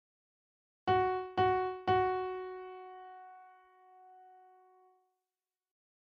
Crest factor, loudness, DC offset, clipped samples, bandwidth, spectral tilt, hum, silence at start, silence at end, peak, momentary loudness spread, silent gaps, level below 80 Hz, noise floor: 18 dB; -33 LUFS; under 0.1%; under 0.1%; 6.2 kHz; -7.5 dB/octave; none; 0.85 s; 2.55 s; -18 dBFS; 20 LU; none; -66 dBFS; under -90 dBFS